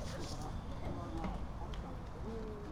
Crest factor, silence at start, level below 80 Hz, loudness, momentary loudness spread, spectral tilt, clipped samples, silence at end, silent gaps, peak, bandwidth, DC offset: 14 dB; 0 s; -46 dBFS; -45 LUFS; 3 LU; -6 dB/octave; under 0.1%; 0 s; none; -28 dBFS; 15.5 kHz; under 0.1%